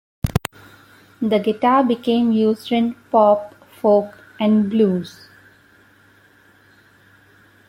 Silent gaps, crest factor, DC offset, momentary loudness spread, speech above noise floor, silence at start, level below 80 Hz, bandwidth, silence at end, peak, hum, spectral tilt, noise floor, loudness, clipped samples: none; 20 dB; under 0.1%; 10 LU; 36 dB; 0.25 s; -44 dBFS; 16 kHz; 2.6 s; 0 dBFS; none; -7 dB/octave; -53 dBFS; -18 LUFS; under 0.1%